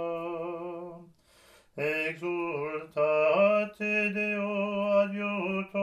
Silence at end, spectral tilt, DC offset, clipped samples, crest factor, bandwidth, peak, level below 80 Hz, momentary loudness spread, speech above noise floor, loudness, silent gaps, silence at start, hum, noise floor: 0 s; -6.5 dB/octave; under 0.1%; under 0.1%; 16 dB; 12.5 kHz; -14 dBFS; -72 dBFS; 13 LU; 29 dB; -29 LUFS; none; 0 s; none; -60 dBFS